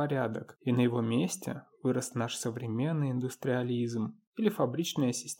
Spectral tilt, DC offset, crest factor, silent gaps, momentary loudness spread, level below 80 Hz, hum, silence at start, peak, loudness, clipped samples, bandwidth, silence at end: -5.5 dB/octave; under 0.1%; 18 dB; 4.27-4.32 s; 7 LU; -78 dBFS; none; 0 s; -12 dBFS; -32 LUFS; under 0.1%; 17 kHz; 0.05 s